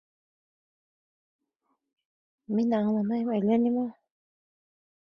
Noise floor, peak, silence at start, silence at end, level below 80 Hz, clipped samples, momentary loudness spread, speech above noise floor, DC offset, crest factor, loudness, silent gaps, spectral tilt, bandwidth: -78 dBFS; -14 dBFS; 2.5 s; 1.15 s; -76 dBFS; under 0.1%; 7 LU; 52 dB; under 0.1%; 16 dB; -27 LUFS; none; -9.5 dB/octave; 6 kHz